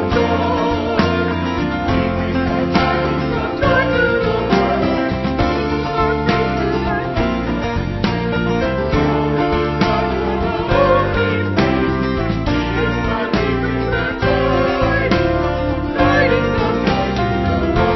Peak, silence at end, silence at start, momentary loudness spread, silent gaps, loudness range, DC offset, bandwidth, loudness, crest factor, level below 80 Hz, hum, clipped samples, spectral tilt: -2 dBFS; 0 s; 0 s; 4 LU; none; 2 LU; under 0.1%; 6.2 kHz; -17 LUFS; 16 dB; -28 dBFS; none; under 0.1%; -7.5 dB/octave